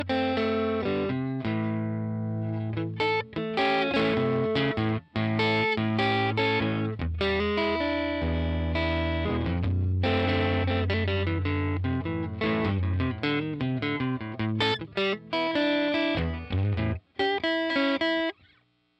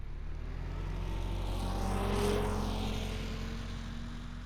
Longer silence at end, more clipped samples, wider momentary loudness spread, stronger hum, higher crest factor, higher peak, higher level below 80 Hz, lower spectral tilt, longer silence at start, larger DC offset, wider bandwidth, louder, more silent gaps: first, 0.65 s vs 0 s; neither; second, 6 LU vs 11 LU; neither; about the same, 14 dB vs 16 dB; first, -12 dBFS vs -18 dBFS; second, -44 dBFS vs -38 dBFS; first, -7.5 dB/octave vs -6 dB/octave; about the same, 0 s vs 0 s; neither; second, 8.2 kHz vs 14.5 kHz; first, -27 LUFS vs -37 LUFS; neither